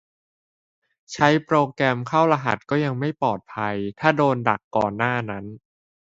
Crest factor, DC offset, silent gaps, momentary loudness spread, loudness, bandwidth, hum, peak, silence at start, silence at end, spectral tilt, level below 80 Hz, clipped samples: 22 dB; under 0.1%; 4.64-4.71 s; 8 LU; -22 LUFS; 8 kHz; none; 0 dBFS; 1.1 s; 0.55 s; -6.5 dB/octave; -60 dBFS; under 0.1%